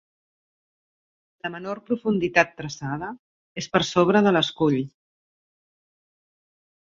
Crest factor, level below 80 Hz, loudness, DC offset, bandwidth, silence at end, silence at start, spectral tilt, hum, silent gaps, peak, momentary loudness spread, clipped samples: 24 dB; -60 dBFS; -23 LUFS; under 0.1%; 7.6 kHz; 2 s; 1.45 s; -5.5 dB/octave; none; 3.19-3.55 s; -2 dBFS; 16 LU; under 0.1%